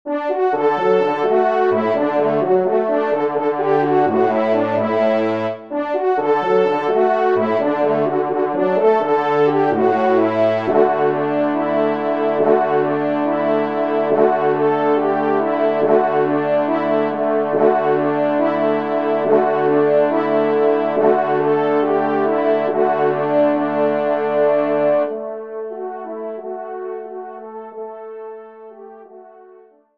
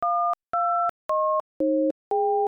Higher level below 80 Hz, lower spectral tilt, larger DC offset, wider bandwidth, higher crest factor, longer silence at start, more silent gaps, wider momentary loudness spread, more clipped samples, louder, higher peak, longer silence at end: about the same, -68 dBFS vs -70 dBFS; about the same, -8 dB/octave vs -7.5 dB/octave; first, 0.4% vs under 0.1%; about the same, 6 kHz vs 6.2 kHz; first, 16 dB vs 8 dB; about the same, 0.05 s vs 0 s; second, none vs 0.89-1.09 s, 1.40-1.60 s, 1.91-2.11 s; first, 12 LU vs 2 LU; neither; first, -17 LUFS vs -25 LUFS; first, -2 dBFS vs -16 dBFS; first, 0.55 s vs 0 s